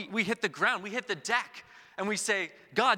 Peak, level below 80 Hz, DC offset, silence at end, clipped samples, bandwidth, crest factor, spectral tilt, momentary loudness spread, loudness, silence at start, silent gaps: -10 dBFS; -76 dBFS; under 0.1%; 0 s; under 0.1%; 17 kHz; 20 dB; -2.5 dB/octave; 12 LU; -30 LUFS; 0 s; none